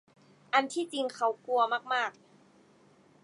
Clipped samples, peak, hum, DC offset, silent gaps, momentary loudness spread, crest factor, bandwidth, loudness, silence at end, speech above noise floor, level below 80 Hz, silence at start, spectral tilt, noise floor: under 0.1%; -10 dBFS; none; under 0.1%; none; 6 LU; 22 dB; 11.5 kHz; -30 LUFS; 1.15 s; 32 dB; -88 dBFS; 0.55 s; -2 dB/octave; -62 dBFS